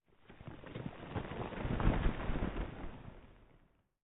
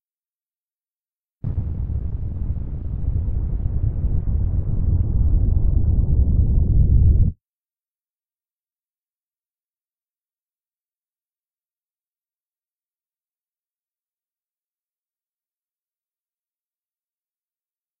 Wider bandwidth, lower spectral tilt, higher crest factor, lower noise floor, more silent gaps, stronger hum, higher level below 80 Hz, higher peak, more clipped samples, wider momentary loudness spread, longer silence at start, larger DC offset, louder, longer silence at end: first, 3.9 kHz vs 1.5 kHz; second, -5.5 dB/octave vs -15 dB/octave; about the same, 22 dB vs 18 dB; second, -69 dBFS vs under -90 dBFS; neither; neither; second, -42 dBFS vs -24 dBFS; second, -16 dBFS vs -4 dBFS; neither; first, 19 LU vs 10 LU; second, 0.3 s vs 1.45 s; neither; second, -40 LUFS vs -22 LUFS; second, 0.45 s vs 10.65 s